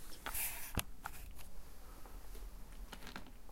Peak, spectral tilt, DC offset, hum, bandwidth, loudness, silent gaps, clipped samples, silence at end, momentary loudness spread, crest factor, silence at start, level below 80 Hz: -16 dBFS; -2.5 dB/octave; under 0.1%; none; 16.5 kHz; -46 LUFS; none; under 0.1%; 0 s; 17 LU; 28 dB; 0 s; -52 dBFS